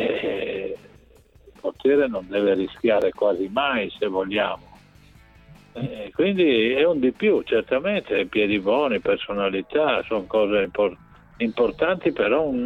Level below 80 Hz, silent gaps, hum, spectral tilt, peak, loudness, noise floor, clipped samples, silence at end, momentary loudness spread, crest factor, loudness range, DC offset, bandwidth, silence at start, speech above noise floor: -54 dBFS; none; none; -7 dB/octave; -8 dBFS; -22 LUFS; -53 dBFS; under 0.1%; 0 s; 9 LU; 16 dB; 4 LU; under 0.1%; 6 kHz; 0 s; 31 dB